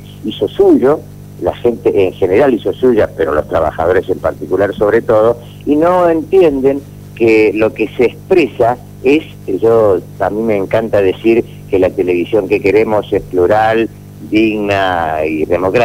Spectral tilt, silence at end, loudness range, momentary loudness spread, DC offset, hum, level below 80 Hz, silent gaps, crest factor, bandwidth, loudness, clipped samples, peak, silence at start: -7 dB/octave; 0 s; 1 LU; 8 LU; 0.3%; 50 Hz at -35 dBFS; -40 dBFS; none; 12 dB; 16 kHz; -12 LUFS; under 0.1%; 0 dBFS; 0 s